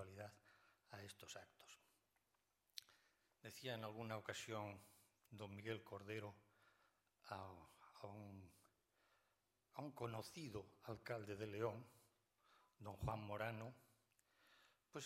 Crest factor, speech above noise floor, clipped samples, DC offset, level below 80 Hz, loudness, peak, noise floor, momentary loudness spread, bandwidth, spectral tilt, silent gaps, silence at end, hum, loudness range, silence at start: 24 dB; 35 dB; under 0.1%; under 0.1%; -76 dBFS; -53 LUFS; -30 dBFS; -87 dBFS; 15 LU; 16 kHz; -5 dB/octave; none; 0 s; none; 9 LU; 0 s